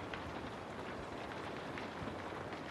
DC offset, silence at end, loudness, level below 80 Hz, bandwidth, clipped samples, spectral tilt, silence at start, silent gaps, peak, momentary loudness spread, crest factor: under 0.1%; 0 s; -45 LUFS; -62 dBFS; 13 kHz; under 0.1%; -5.5 dB/octave; 0 s; none; -26 dBFS; 1 LU; 18 dB